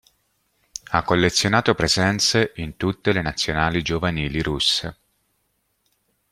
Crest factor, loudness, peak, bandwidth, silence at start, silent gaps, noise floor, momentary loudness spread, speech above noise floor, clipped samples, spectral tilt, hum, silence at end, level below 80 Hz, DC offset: 22 dB; -20 LUFS; -2 dBFS; 15 kHz; 0.9 s; none; -70 dBFS; 8 LU; 49 dB; under 0.1%; -4 dB/octave; none; 1.4 s; -42 dBFS; under 0.1%